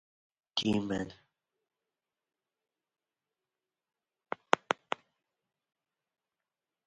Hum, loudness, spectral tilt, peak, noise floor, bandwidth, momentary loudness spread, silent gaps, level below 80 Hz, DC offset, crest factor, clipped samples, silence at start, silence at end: none; -34 LUFS; -4.5 dB/octave; -4 dBFS; under -90 dBFS; 9 kHz; 13 LU; none; -68 dBFS; under 0.1%; 36 dB; under 0.1%; 0.55 s; 2.15 s